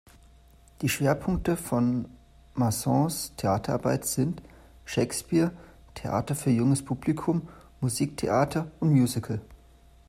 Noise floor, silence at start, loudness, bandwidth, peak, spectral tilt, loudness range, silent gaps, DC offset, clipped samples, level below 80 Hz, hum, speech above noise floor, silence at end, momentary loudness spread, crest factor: -55 dBFS; 0.8 s; -27 LUFS; 16 kHz; -10 dBFS; -6 dB/octave; 2 LU; none; under 0.1%; under 0.1%; -50 dBFS; none; 29 dB; 0.55 s; 10 LU; 18 dB